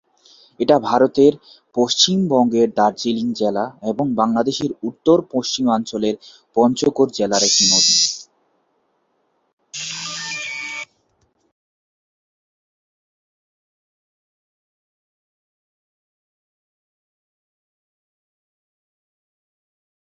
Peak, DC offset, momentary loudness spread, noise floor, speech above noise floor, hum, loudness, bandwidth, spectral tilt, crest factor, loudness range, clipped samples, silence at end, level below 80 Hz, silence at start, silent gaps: -2 dBFS; under 0.1%; 14 LU; -66 dBFS; 49 dB; none; -17 LUFS; 7.8 kHz; -3 dB/octave; 20 dB; 13 LU; under 0.1%; 9.3 s; -62 dBFS; 0.6 s; 9.53-9.57 s